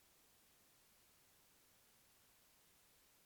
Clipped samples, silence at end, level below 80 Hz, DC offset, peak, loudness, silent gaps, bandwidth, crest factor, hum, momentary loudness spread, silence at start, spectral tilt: under 0.1%; 0 s; -88 dBFS; under 0.1%; -60 dBFS; -70 LUFS; none; over 20 kHz; 14 dB; none; 0 LU; 0 s; -1.5 dB/octave